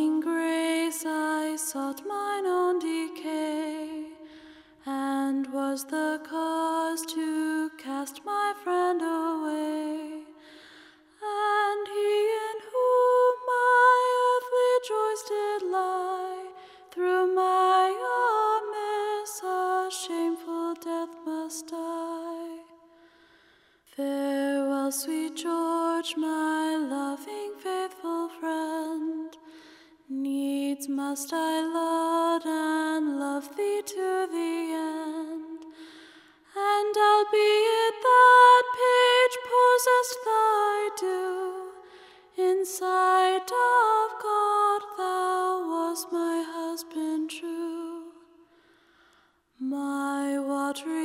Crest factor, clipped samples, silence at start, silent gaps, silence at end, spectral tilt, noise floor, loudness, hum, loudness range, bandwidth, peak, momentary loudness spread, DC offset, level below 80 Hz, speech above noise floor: 18 dB; under 0.1%; 0 s; none; 0 s; -1 dB/octave; -64 dBFS; -26 LUFS; none; 12 LU; 16 kHz; -8 dBFS; 13 LU; under 0.1%; -80 dBFS; 34 dB